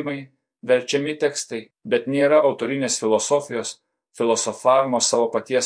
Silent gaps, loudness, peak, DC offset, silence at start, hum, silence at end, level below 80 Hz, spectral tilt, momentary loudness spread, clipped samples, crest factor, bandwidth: none; -21 LUFS; -4 dBFS; under 0.1%; 0 s; none; 0 s; -82 dBFS; -3 dB/octave; 13 LU; under 0.1%; 16 dB; 10.5 kHz